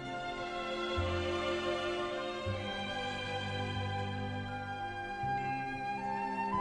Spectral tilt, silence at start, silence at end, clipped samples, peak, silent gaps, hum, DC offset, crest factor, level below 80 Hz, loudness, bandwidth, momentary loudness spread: -5.5 dB/octave; 0 s; 0 s; under 0.1%; -22 dBFS; none; none; under 0.1%; 14 dB; -54 dBFS; -37 LUFS; 11 kHz; 5 LU